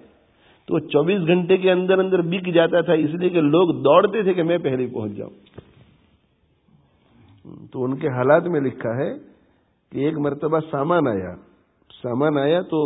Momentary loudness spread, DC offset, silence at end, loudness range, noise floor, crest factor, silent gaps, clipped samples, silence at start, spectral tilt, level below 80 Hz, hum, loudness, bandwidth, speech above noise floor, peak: 11 LU; under 0.1%; 0 s; 10 LU; -63 dBFS; 20 dB; none; under 0.1%; 0.7 s; -11.5 dB/octave; -60 dBFS; none; -20 LUFS; 4 kHz; 44 dB; 0 dBFS